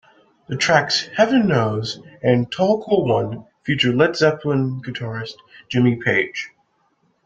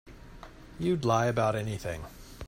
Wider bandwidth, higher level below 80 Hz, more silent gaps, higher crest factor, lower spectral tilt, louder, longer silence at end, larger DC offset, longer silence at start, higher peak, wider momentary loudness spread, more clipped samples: second, 9 kHz vs 16 kHz; second, -56 dBFS vs -50 dBFS; neither; about the same, 18 dB vs 20 dB; about the same, -5.5 dB/octave vs -6 dB/octave; first, -19 LUFS vs -29 LUFS; first, 0.8 s vs 0 s; neither; first, 0.5 s vs 0.05 s; first, -2 dBFS vs -10 dBFS; second, 13 LU vs 23 LU; neither